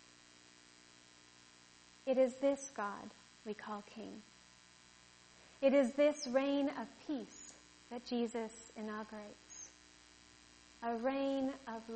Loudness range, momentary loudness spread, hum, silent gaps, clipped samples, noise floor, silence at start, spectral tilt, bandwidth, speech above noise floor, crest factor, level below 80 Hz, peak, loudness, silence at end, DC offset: 9 LU; 27 LU; 60 Hz at -70 dBFS; none; under 0.1%; -63 dBFS; 2.05 s; -4 dB/octave; 8.4 kHz; 26 dB; 20 dB; -76 dBFS; -20 dBFS; -38 LUFS; 0 s; under 0.1%